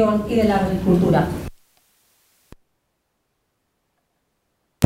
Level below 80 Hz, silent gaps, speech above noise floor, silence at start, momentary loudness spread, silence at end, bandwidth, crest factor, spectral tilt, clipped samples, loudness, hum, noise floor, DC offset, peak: -42 dBFS; none; 54 dB; 0 s; 13 LU; 0 s; 15.5 kHz; 22 dB; -7.5 dB/octave; under 0.1%; -19 LUFS; none; -72 dBFS; under 0.1%; 0 dBFS